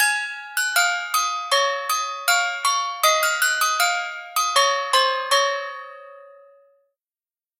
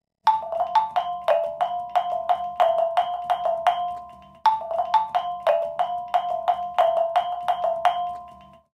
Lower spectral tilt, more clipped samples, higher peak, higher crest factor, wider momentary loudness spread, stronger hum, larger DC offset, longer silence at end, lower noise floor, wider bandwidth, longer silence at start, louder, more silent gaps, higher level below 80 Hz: second, 7 dB/octave vs -3 dB/octave; neither; about the same, -4 dBFS vs -6 dBFS; about the same, 18 dB vs 18 dB; first, 8 LU vs 5 LU; neither; neither; first, 1.3 s vs 0.3 s; first, under -90 dBFS vs -46 dBFS; first, 16.5 kHz vs 12 kHz; second, 0 s vs 0.25 s; first, -20 LUFS vs -24 LUFS; neither; second, under -90 dBFS vs -64 dBFS